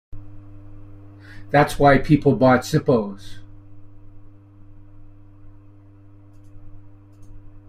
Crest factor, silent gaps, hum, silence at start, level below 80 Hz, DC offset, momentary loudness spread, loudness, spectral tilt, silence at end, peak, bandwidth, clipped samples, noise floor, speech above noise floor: 20 dB; none; none; 0.15 s; -40 dBFS; under 0.1%; 27 LU; -18 LUFS; -7 dB/octave; 0.1 s; -2 dBFS; 15 kHz; under 0.1%; -46 dBFS; 29 dB